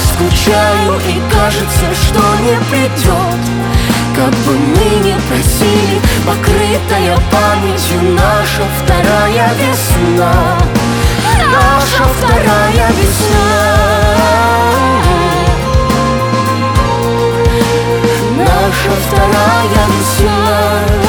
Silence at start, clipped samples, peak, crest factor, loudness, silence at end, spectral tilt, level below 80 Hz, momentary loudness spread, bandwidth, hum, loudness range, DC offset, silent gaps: 0 s; under 0.1%; 0 dBFS; 10 dB; -10 LUFS; 0 s; -5 dB/octave; -18 dBFS; 3 LU; over 20 kHz; none; 2 LU; under 0.1%; none